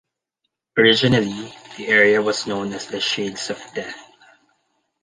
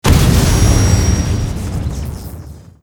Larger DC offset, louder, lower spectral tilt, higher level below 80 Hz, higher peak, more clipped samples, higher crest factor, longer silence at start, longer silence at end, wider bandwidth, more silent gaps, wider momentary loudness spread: neither; second, -18 LUFS vs -14 LUFS; about the same, -4 dB/octave vs -5 dB/octave; second, -56 dBFS vs -18 dBFS; about the same, -2 dBFS vs 0 dBFS; neither; first, 20 dB vs 14 dB; first, 0.75 s vs 0.05 s; first, 1 s vs 0.2 s; second, 10 kHz vs over 20 kHz; neither; about the same, 18 LU vs 17 LU